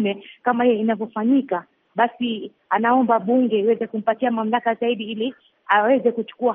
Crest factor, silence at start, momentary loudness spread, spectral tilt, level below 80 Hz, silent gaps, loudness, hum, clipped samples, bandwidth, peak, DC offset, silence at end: 18 dB; 0 s; 9 LU; -3.5 dB/octave; -72 dBFS; none; -21 LUFS; none; under 0.1%; 3.8 kHz; -4 dBFS; under 0.1%; 0 s